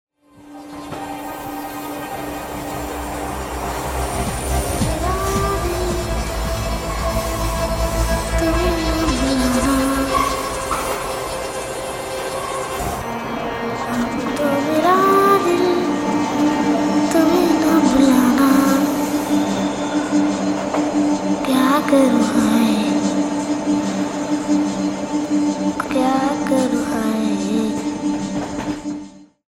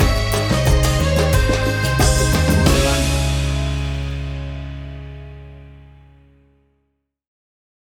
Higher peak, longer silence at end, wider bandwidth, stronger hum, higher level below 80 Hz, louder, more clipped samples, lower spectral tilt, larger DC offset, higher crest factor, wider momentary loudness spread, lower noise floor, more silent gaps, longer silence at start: about the same, -2 dBFS vs -4 dBFS; second, 0.25 s vs 2.25 s; second, 16.5 kHz vs 18.5 kHz; neither; second, -32 dBFS vs -24 dBFS; about the same, -19 LUFS vs -18 LUFS; neither; about the same, -5 dB/octave vs -5 dB/octave; neither; about the same, 16 dB vs 14 dB; second, 12 LU vs 18 LU; second, -42 dBFS vs -70 dBFS; neither; first, 0.4 s vs 0 s